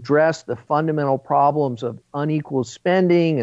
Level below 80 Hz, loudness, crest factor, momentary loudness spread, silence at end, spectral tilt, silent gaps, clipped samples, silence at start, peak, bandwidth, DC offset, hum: -66 dBFS; -20 LUFS; 14 dB; 10 LU; 0 s; -7 dB/octave; none; under 0.1%; 0 s; -6 dBFS; 8 kHz; under 0.1%; none